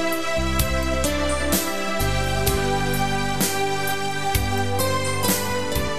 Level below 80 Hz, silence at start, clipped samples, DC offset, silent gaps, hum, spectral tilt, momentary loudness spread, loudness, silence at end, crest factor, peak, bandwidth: -32 dBFS; 0 s; under 0.1%; 3%; none; none; -4 dB/octave; 3 LU; -22 LUFS; 0 s; 16 dB; -6 dBFS; 14 kHz